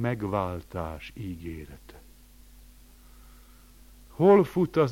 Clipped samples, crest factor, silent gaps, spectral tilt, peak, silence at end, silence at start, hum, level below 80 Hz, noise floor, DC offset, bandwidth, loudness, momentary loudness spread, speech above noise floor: under 0.1%; 22 dB; none; -8 dB/octave; -8 dBFS; 0 s; 0 s; none; -50 dBFS; -52 dBFS; under 0.1%; 17 kHz; -26 LUFS; 22 LU; 27 dB